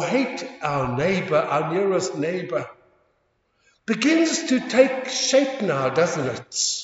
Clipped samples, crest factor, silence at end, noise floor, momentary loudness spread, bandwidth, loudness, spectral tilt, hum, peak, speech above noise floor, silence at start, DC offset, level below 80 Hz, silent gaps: under 0.1%; 20 dB; 0 s; -68 dBFS; 9 LU; 8 kHz; -22 LUFS; -4 dB/octave; none; -2 dBFS; 46 dB; 0 s; under 0.1%; -58 dBFS; none